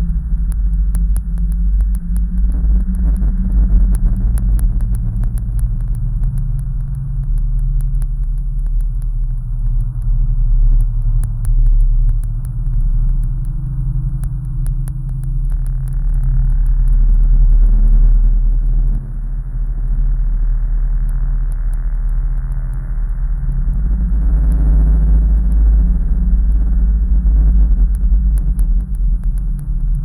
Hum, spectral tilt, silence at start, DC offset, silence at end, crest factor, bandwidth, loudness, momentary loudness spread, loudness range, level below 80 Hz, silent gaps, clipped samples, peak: none; -9.5 dB/octave; 0 s; under 0.1%; 0 s; 10 dB; 1.8 kHz; -19 LUFS; 8 LU; 6 LU; -14 dBFS; none; under 0.1%; -2 dBFS